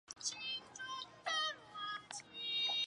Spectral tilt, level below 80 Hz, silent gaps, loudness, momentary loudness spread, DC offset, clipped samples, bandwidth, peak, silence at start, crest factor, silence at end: 1 dB/octave; -82 dBFS; none; -41 LUFS; 9 LU; under 0.1%; under 0.1%; 11 kHz; -24 dBFS; 0.1 s; 18 dB; 0 s